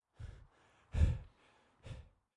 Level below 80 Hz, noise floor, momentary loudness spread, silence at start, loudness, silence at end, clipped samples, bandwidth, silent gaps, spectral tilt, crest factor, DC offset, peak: -44 dBFS; -70 dBFS; 23 LU; 0.2 s; -38 LUFS; 0.35 s; under 0.1%; 9.8 kHz; none; -7.5 dB/octave; 22 dB; under 0.1%; -20 dBFS